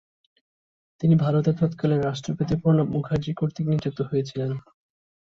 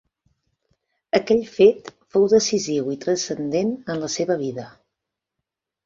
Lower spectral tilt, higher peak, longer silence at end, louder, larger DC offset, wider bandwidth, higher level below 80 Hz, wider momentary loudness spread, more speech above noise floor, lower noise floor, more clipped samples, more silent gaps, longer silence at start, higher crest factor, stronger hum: first, -8.5 dB/octave vs -4.5 dB/octave; second, -10 dBFS vs -2 dBFS; second, 0.65 s vs 1.15 s; second, -24 LUFS vs -21 LUFS; neither; about the same, 7.2 kHz vs 7.8 kHz; first, -52 dBFS vs -62 dBFS; about the same, 8 LU vs 10 LU; first, over 67 dB vs 63 dB; first, under -90 dBFS vs -83 dBFS; neither; neither; second, 1 s vs 1.15 s; about the same, 16 dB vs 20 dB; neither